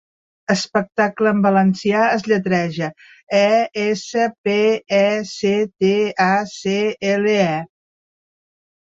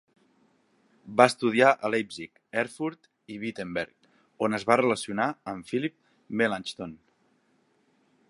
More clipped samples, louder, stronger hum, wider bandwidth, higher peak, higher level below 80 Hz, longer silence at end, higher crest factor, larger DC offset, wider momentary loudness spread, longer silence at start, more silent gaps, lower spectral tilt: neither; first, -18 LUFS vs -27 LUFS; neither; second, 7.8 kHz vs 11.5 kHz; about the same, -2 dBFS vs -2 dBFS; first, -62 dBFS vs -70 dBFS; about the same, 1.35 s vs 1.35 s; second, 16 dB vs 28 dB; neither; second, 6 LU vs 16 LU; second, 0.5 s vs 1.05 s; first, 3.23-3.27 s, 4.38-4.44 s vs none; about the same, -5.5 dB/octave vs -5 dB/octave